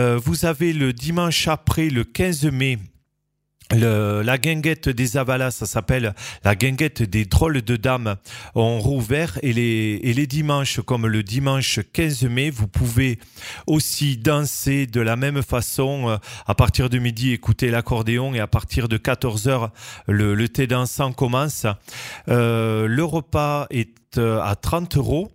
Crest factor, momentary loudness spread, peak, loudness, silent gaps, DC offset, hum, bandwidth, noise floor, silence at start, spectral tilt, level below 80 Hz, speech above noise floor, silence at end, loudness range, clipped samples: 20 dB; 5 LU; 0 dBFS; -21 LUFS; none; under 0.1%; none; 16 kHz; -74 dBFS; 0 s; -5.5 dB/octave; -36 dBFS; 54 dB; 0.05 s; 1 LU; under 0.1%